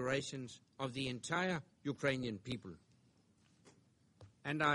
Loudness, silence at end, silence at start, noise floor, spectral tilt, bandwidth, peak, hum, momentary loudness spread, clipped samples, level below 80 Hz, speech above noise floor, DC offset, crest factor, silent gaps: -41 LUFS; 0 s; 0 s; -72 dBFS; -5 dB/octave; 11.5 kHz; -20 dBFS; none; 11 LU; under 0.1%; -72 dBFS; 32 dB; under 0.1%; 22 dB; none